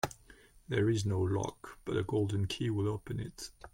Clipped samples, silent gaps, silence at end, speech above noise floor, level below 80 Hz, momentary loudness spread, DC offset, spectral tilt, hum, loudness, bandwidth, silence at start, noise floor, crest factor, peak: under 0.1%; none; 0.05 s; 26 dB; -56 dBFS; 12 LU; under 0.1%; -6 dB/octave; none; -34 LUFS; 16.5 kHz; 0.05 s; -59 dBFS; 20 dB; -14 dBFS